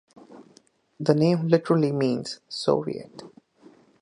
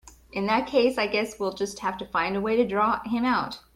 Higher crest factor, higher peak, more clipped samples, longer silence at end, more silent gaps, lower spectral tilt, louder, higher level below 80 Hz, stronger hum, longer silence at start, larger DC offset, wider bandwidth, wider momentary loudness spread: first, 22 dB vs 16 dB; first, -4 dBFS vs -10 dBFS; neither; first, 0.75 s vs 0.15 s; neither; first, -7 dB/octave vs -5 dB/octave; about the same, -24 LUFS vs -25 LUFS; second, -68 dBFS vs -56 dBFS; neither; first, 0.3 s vs 0.05 s; neither; second, 11 kHz vs 15.5 kHz; first, 15 LU vs 7 LU